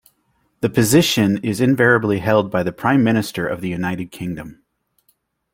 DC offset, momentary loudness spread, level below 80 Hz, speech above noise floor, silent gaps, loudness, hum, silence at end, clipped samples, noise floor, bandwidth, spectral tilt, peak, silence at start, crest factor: under 0.1%; 13 LU; -52 dBFS; 48 dB; none; -18 LUFS; none; 1 s; under 0.1%; -65 dBFS; 16.5 kHz; -5 dB/octave; -2 dBFS; 0.6 s; 18 dB